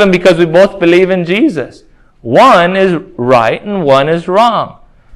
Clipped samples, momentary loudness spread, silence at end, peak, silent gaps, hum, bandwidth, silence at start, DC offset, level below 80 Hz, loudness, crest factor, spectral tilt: 2%; 10 LU; 0.45 s; 0 dBFS; none; none; 12.5 kHz; 0 s; under 0.1%; -44 dBFS; -9 LUFS; 10 dB; -6 dB/octave